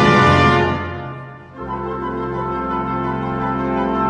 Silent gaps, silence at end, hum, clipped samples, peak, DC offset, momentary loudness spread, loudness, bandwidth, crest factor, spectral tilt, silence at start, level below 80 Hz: none; 0 s; none; under 0.1%; -2 dBFS; under 0.1%; 18 LU; -18 LUFS; 10 kHz; 16 dB; -6.5 dB/octave; 0 s; -38 dBFS